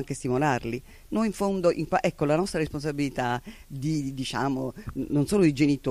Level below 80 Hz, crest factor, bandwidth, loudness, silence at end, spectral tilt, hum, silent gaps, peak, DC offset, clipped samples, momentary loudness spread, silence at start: -48 dBFS; 18 dB; 15 kHz; -27 LUFS; 0 s; -6 dB/octave; none; none; -8 dBFS; under 0.1%; under 0.1%; 11 LU; 0 s